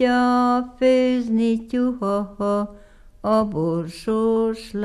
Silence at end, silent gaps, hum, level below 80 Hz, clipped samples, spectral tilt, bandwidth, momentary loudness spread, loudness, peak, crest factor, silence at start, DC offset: 0 s; none; none; -48 dBFS; under 0.1%; -7 dB/octave; 12 kHz; 7 LU; -21 LUFS; -8 dBFS; 14 dB; 0 s; under 0.1%